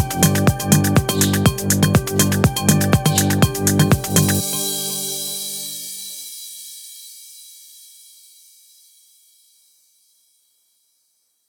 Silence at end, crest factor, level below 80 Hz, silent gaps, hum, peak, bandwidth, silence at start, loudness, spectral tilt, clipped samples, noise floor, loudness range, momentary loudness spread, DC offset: 3.95 s; 20 dB; -40 dBFS; none; none; 0 dBFS; over 20 kHz; 0 s; -17 LUFS; -4.5 dB/octave; under 0.1%; -66 dBFS; 19 LU; 19 LU; under 0.1%